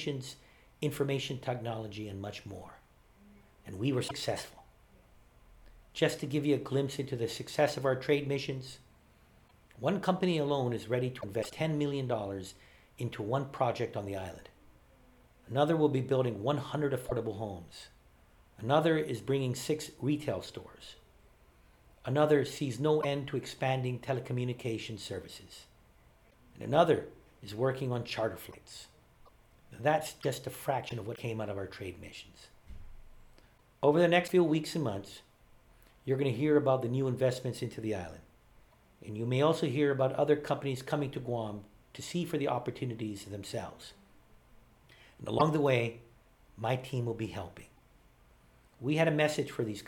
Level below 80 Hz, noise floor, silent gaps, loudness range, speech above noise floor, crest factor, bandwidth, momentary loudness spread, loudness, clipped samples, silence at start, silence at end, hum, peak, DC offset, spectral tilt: -62 dBFS; -62 dBFS; none; 7 LU; 30 dB; 24 dB; 19 kHz; 19 LU; -33 LUFS; under 0.1%; 0 s; 0 s; none; -10 dBFS; under 0.1%; -6 dB/octave